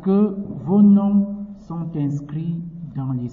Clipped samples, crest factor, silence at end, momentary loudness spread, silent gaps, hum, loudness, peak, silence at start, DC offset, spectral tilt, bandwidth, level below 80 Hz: under 0.1%; 14 dB; 0 s; 16 LU; none; none; -20 LUFS; -6 dBFS; 0 s; under 0.1%; -12 dB/octave; 3.2 kHz; -52 dBFS